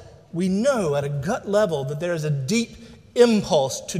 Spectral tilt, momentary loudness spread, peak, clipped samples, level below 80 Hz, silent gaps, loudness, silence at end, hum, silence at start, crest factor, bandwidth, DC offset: -5.5 dB/octave; 9 LU; -4 dBFS; under 0.1%; -54 dBFS; none; -22 LUFS; 0 s; none; 0 s; 18 dB; 15.5 kHz; under 0.1%